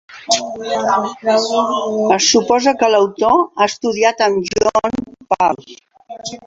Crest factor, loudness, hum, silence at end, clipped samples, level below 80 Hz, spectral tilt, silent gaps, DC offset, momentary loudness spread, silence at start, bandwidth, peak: 16 dB; -15 LUFS; none; 0.05 s; under 0.1%; -52 dBFS; -2.5 dB/octave; none; under 0.1%; 9 LU; 0.1 s; 8 kHz; 0 dBFS